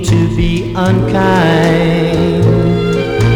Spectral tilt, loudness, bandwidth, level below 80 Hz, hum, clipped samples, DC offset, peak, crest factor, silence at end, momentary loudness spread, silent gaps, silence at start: -7 dB/octave; -12 LUFS; 12.5 kHz; -26 dBFS; none; under 0.1%; under 0.1%; 0 dBFS; 10 dB; 0 s; 4 LU; none; 0 s